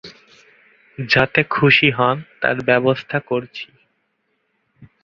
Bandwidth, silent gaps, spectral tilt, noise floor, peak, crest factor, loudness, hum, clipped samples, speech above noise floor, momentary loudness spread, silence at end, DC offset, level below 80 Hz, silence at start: 7.2 kHz; none; -6.5 dB/octave; -69 dBFS; -2 dBFS; 20 dB; -17 LUFS; none; under 0.1%; 51 dB; 19 LU; 0.2 s; under 0.1%; -54 dBFS; 0.05 s